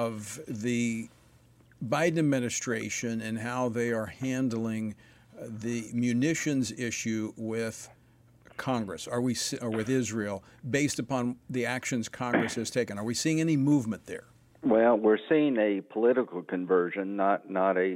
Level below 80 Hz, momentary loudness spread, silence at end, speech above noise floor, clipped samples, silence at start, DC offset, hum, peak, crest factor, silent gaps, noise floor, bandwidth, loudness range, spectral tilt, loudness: -68 dBFS; 12 LU; 0 s; 31 dB; under 0.1%; 0 s; under 0.1%; none; -12 dBFS; 16 dB; none; -60 dBFS; 16 kHz; 6 LU; -5 dB/octave; -29 LUFS